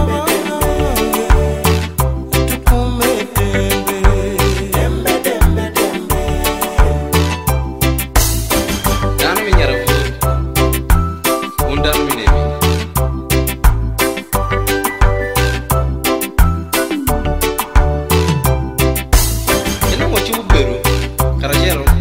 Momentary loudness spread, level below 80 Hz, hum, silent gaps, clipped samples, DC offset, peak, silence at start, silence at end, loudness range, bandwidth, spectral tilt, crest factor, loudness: 3 LU; -18 dBFS; none; none; under 0.1%; 0.3%; 0 dBFS; 0 s; 0 s; 1 LU; 16.5 kHz; -4.5 dB/octave; 14 dB; -15 LUFS